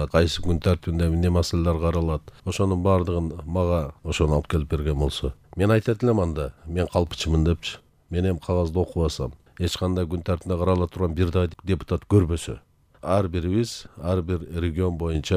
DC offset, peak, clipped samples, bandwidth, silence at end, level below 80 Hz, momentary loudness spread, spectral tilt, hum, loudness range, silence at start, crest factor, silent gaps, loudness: under 0.1%; -6 dBFS; under 0.1%; 14 kHz; 0 s; -38 dBFS; 9 LU; -6.5 dB/octave; none; 2 LU; 0 s; 18 dB; none; -24 LUFS